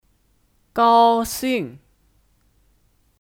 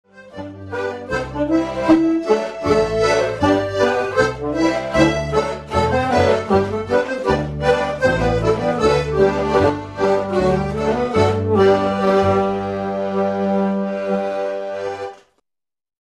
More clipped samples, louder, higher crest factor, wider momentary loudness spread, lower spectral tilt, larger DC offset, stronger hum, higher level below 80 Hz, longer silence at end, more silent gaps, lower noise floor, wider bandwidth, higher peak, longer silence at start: neither; about the same, -18 LUFS vs -18 LUFS; about the same, 18 dB vs 18 dB; first, 15 LU vs 9 LU; second, -4 dB/octave vs -6.5 dB/octave; neither; neither; second, -52 dBFS vs -38 dBFS; first, 1.45 s vs 0.9 s; neither; second, -62 dBFS vs -86 dBFS; first, 19.5 kHz vs 12 kHz; second, -4 dBFS vs 0 dBFS; first, 0.75 s vs 0.15 s